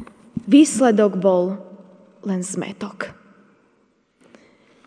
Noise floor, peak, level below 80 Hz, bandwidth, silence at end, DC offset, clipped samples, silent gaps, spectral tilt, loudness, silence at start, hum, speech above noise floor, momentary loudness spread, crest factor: -62 dBFS; -2 dBFS; -64 dBFS; 10 kHz; 1.75 s; under 0.1%; under 0.1%; none; -5.5 dB/octave; -18 LUFS; 0 s; none; 45 dB; 19 LU; 18 dB